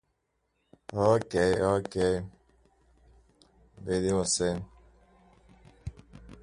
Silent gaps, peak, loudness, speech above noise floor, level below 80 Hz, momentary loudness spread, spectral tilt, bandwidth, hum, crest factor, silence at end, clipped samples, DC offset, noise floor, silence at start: none; -10 dBFS; -28 LUFS; 50 dB; -52 dBFS; 20 LU; -4.5 dB/octave; 11.5 kHz; none; 22 dB; 0.1 s; under 0.1%; under 0.1%; -77 dBFS; 0.9 s